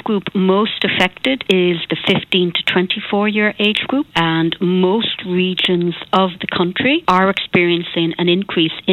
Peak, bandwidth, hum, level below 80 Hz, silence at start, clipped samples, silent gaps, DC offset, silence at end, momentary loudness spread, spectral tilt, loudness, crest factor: -2 dBFS; 11 kHz; none; -52 dBFS; 0.05 s; under 0.1%; none; under 0.1%; 0 s; 4 LU; -6.5 dB/octave; -16 LUFS; 16 dB